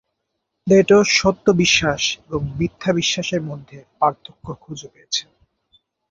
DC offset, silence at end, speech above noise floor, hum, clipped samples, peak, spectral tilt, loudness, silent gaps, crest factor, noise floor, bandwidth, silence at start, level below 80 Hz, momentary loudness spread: under 0.1%; 0.9 s; 57 dB; none; under 0.1%; -2 dBFS; -4 dB/octave; -18 LUFS; none; 18 dB; -76 dBFS; 7.8 kHz; 0.65 s; -46 dBFS; 22 LU